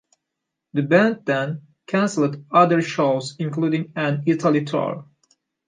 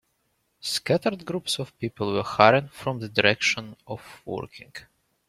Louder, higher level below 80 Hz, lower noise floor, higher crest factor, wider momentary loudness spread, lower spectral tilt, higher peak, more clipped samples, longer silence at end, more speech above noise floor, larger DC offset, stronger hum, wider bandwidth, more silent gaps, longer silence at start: first, -21 LUFS vs -24 LUFS; second, -70 dBFS vs -62 dBFS; first, -82 dBFS vs -72 dBFS; about the same, 20 dB vs 24 dB; second, 10 LU vs 20 LU; first, -6.5 dB/octave vs -4 dB/octave; about the same, -2 dBFS vs -2 dBFS; neither; first, 0.65 s vs 0.5 s; first, 62 dB vs 47 dB; neither; neither; second, 9.6 kHz vs 16 kHz; neither; about the same, 0.75 s vs 0.65 s